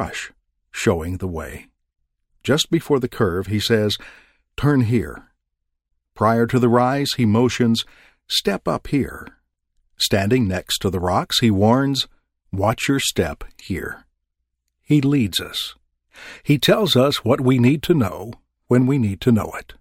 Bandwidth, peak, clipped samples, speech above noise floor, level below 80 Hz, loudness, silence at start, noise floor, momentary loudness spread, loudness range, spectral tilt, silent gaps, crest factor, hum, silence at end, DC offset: 16.5 kHz; -2 dBFS; under 0.1%; 58 dB; -44 dBFS; -19 LUFS; 0 s; -77 dBFS; 15 LU; 4 LU; -5.5 dB/octave; none; 18 dB; none; 0.1 s; under 0.1%